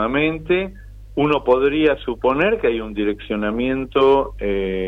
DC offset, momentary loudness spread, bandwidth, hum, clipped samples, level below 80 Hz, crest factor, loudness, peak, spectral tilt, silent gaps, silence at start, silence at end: under 0.1%; 8 LU; 5.2 kHz; none; under 0.1%; -38 dBFS; 14 dB; -19 LUFS; -4 dBFS; -8 dB/octave; none; 0 s; 0 s